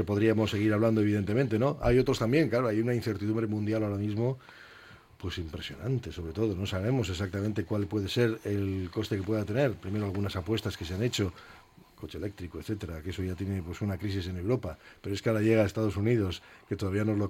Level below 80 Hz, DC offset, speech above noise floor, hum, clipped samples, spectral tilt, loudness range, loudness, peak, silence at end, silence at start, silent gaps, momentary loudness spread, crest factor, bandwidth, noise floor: -50 dBFS; under 0.1%; 24 dB; none; under 0.1%; -7 dB/octave; 8 LU; -30 LUFS; -12 dBFS; 0 s; 0 s; none; 13 LU; 18 dB; 16 kHz; -53 dBFS